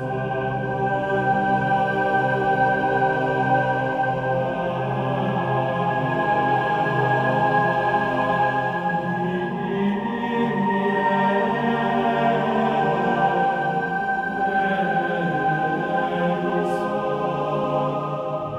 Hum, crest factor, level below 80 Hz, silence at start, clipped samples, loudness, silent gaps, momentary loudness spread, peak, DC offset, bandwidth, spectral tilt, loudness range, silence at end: none; 14 dB; -54 dBFS; 0 s; under 0.1%; -22 LUFS; none; 5 LU; -8 dBFS; under 0.1%; 10 kHz; -7.5 dB/octave; 2 LU; 0 s